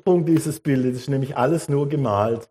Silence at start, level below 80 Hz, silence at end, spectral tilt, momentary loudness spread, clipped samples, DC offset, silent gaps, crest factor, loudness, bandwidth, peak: 0.05 s; -60 dBFS; 0.05 s; -7.5 dB/octave; 5 LU; under 0.1%; under 0.1%; none; 14 dB; -21 LUFS; 15.5 kHz; -6 dBFS